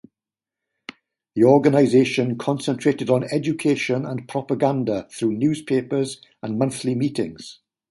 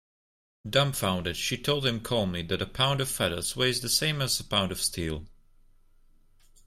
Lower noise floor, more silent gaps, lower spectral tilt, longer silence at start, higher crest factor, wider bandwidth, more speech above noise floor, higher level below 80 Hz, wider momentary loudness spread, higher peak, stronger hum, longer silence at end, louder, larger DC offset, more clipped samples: first, -89 dBFS vs -58 dBFS; neither; first, -6.5 dB/octave vs -3.5 dB/octave; first, 1.35 s vs 0.65 s; about the same, 20 dB vs 20 dB; second, 11.5 kHz vs 16 kHz; first, 69 dB vs 30 dB; second, -62 dBFS vs -50 dBFS; first, 16 LU vs 6 LU; first, -2 dBFS vs -10 dBFS; neither; second, 0.4 s vs 1.4 s; first, -21 LUFS vs -27 LUFS; neither; neither